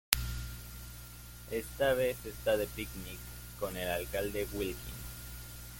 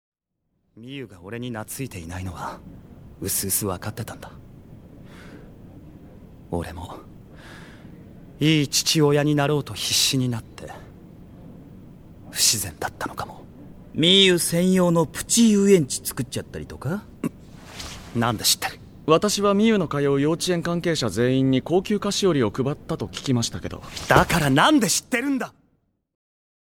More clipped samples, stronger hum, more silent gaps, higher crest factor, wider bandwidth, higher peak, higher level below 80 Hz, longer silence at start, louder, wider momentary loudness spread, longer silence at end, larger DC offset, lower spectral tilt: neither; first, 60 Hz at -50 dBFS vs none; neither; first, 34 dB vs 24 dB; about the same, 17 kHz vs 18.5 kHz; second, -4 dBFS vs 0 dBFS; about the same, -48 dBFS vs -48 dBFS; second, 0.1 s vs 0.75 s; second, -36 LUFS vs -21 LUFS; second, 15 LU vs 19 LU; second, 0 s vs 1.3 s; neither; about the same, -3.5 dB/octave vs -4 dB/octave